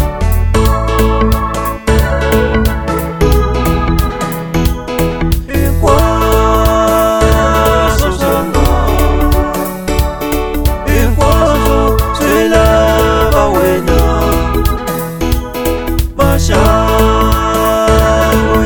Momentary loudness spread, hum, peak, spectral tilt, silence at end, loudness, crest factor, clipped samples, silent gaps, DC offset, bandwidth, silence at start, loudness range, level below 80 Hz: 6 LU; none; 0 dBFS; -6 dB/octave; 0 s; -12 LUFS; 10 dB; 0.2%; none; 0.6%; over 20 kHz; 0 s; 3 LU; -16 dBFS